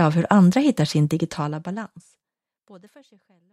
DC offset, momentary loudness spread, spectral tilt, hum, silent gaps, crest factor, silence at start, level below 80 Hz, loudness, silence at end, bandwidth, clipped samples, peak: under 0.1%; 16 LU; -7 dB/octave; none; none; 22 dB; 0 s; -62 dBFS; -20 LUFS; 0.75 s; 12.5 kHz; under 0.1%; 0 dBFS